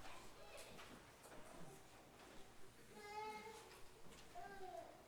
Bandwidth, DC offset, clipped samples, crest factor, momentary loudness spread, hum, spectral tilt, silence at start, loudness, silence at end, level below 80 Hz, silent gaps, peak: over 20 kHz; under 0.1%; under 0.1%; 16 dB; 10 LU; none; -3.5 dB/octave; 0 s; -58 LUFS; 0 s; -72 dBFS; none; -42 dBFS